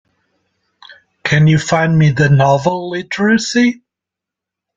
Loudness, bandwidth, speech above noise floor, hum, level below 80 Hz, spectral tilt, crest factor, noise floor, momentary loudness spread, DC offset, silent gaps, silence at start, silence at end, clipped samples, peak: -13 LUFS; 7.8 kHz; 72 dB; none; -48 dBFS; -6 dB/octave; 14 dB; -84 dBFS; 10 LU; under 0.1%; none; 0.9 s; 1 s; under 0.1%; -2 dBFS